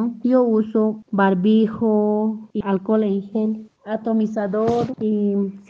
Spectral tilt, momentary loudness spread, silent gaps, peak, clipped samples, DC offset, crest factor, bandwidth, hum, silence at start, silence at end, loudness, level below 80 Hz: -9 dB/octave; 7 LU; none; -6 dBFS; under 0.1%; under 0.1%; 14 dB; 6.8 kHz; none; 0 s; 0.1 s; -20 LUFS; -60 dBFS